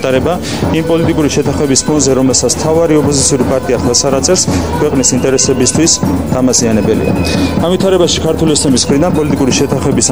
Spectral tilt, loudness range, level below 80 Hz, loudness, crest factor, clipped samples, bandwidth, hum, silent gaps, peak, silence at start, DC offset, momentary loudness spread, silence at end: -4 dB/octave; 1 LU; -30 dBFS; -10 LUFS; 10 dB; under 0.1%; over 20 kHz; none; none; 0 dBFS; 0 s; 2%; 3 LU; 0 s